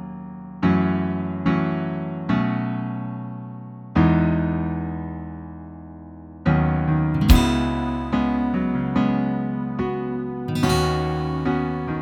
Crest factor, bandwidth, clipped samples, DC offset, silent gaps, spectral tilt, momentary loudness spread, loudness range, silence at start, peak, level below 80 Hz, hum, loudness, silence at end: 22 dB; 16 kHz; under 0.1%; under 0.1%; none; -7 dB/octave; 17 LU; 4 LU; 0 s; -2 dBFS; -32 dBFS; none; -22 LUFS; 0 s